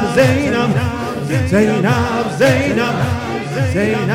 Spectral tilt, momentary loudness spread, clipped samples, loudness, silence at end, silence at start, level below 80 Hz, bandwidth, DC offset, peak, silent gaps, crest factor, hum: -6 dB/octave; 7 LU; under 0.1%; -15 LUFS; 0 s; 0 s; -42 dBFS; 16.5 kHz; 0.3%; 0 dBFS; none; 14 dB; none